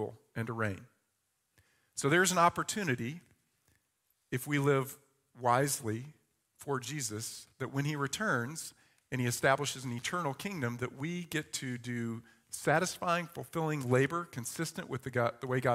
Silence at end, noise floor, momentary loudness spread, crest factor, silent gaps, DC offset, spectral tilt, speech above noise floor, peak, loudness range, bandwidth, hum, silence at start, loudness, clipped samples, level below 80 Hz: 0 s; -80 dBFS; 13 LU; 22 dB; none; under 0.1%; -4.5 dB/octave; 47 dB; -12 dBFS; 3 LU; 16 kHz; none; 0 s; -34 LUFS; under 0.1%; -72 dBFS